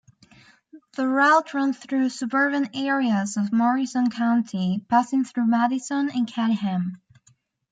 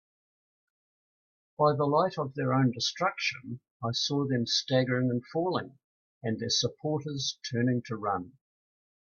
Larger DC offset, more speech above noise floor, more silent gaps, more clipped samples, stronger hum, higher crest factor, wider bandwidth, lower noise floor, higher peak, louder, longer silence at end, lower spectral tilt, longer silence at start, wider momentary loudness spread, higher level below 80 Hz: neither; second, 40 dB vs over 61 dB; second, none vs 3.71-3.80 s, 5.84-6.21 s; neither; neither; about the same, 16 dB vs 20 dB; first, 9.4 kHz vs 7.2 kHz; second, -62 dBFS vs under -90 dBFS; first, -6 dBFS vs -10 dBFS; first, -23 LUFS vs -29 LUFS; second, 0.75 s vs 0.9 s; about the same, -5.5 dB/octave vs -5 dB/octave; second, 0.75 s vs 1.6 s; second, 6 LU vs 9 LU; about the same, -72 dBFS vs -70 dBFS